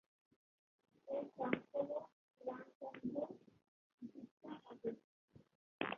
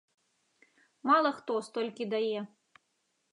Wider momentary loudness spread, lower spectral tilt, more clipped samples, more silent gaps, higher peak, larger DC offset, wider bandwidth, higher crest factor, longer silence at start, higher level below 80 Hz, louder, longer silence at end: first, 16 LU vs 12 LU; about the same, -4 dB/octave vs -5 dB/octave; neither; first, 2.13-2.29 s, 2.75-2.81 s, 3.68-3.98 s, 4.31-4.37 s, 5.04-5.28 s, 5.55-5.79 s vs none; second, -20 dBFS vs -12 dBFS; neither; second, 6.8 kHz vs 11 kHz; first, 28 dB vs 20 dB; about the same, 1.05 s vs 1.05 s; about the same, -86 dBFS vs -90 dBFS; second, -47 LUFS vs -31 LUFS; second, 0 s vs 0.85 s